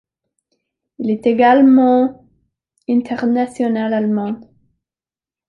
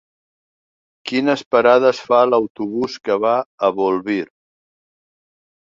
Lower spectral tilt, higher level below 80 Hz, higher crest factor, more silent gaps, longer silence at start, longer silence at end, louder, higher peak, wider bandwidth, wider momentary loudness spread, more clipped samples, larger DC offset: first, -7.5 dB/octave vs -5.5 dB/octave; about the same, -62 dBFS vs -64 dBFS; about the same, 14 dB vs 18 dB; second, none vs 1.46-1.51 s, 2.50-2.55 s, 3.46-3.58 s; about the same, 1 s vs 1.05 s; second, 1.05 s vs 1.4 s; about the same, -15 LUFS vs -17 LUFS; about the same, -2 dBFS vs -2 dBFS; first, 9.2 kHz vs 7.6 kHz; first, 14 LU vs 10 LU; neither; neither